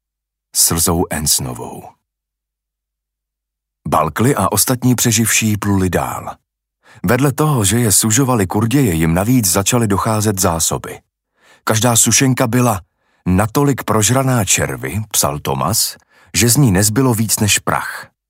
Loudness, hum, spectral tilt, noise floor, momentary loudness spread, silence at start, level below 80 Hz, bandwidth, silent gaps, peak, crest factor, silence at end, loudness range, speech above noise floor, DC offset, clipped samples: -14 LUFS; none; -4 dB/octave; -81 dBFS; 10 LU; 0.55 s; -40 dBFS; 16.5 kHz; none; 0 dBFS; 14 dB; 0.25 s; 4 LU; 66 dB; under 0.1%; under 0.1%